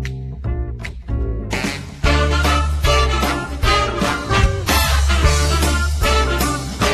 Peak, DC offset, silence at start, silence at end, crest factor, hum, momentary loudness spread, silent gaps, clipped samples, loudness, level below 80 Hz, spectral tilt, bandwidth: -2 dBFS; under 0.1%; 0 s; 0 s; 16 dB; none; 10 LU; none; under 0.1%; -18 LUFS; -20 dBFS; -4.5 dB/octave; 14 kHz